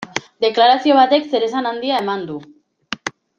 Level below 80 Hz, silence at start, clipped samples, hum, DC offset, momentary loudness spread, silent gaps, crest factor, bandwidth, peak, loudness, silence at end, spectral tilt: -66 dBFS; 0 s; under 0.1%; none; under 0.1%; 15 LU; none; 16 dB; 8.6 kHz; -2 dBFS; -17 LUFS; 0.3 s; -4 dB/octave